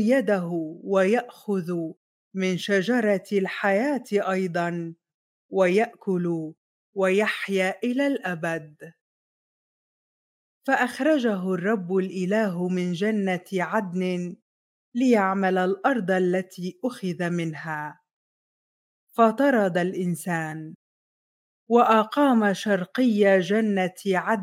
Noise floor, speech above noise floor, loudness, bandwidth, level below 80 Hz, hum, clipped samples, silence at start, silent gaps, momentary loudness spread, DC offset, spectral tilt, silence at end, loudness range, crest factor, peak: under -90 dBFS; over 67 dB; -24 LUFS; 16 kHz; -82 dBFS; none; under 0.1%; 0 s; 1.97-2.31 s, 5.14-5.49 s, 6.57-6.93 s, 9.01-10.61 s, 14.42-14.92 s, 18.13-19.07 s, 20.75-21.67 s; 11 LU; under 0.1%; -6.5 dB/octave; 0 s; 5 LU; 18 dB; -6 dBFS